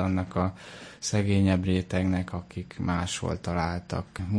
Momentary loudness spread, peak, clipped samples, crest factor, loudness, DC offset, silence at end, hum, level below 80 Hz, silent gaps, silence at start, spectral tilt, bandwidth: 12 LU; -12 dBFS; under 0.1%; 16 dB; -28 LUFS; under 0.1%; 0 s; none; -48 dBFS; none; 0 s; -6 dB/octave; 10.5 kHz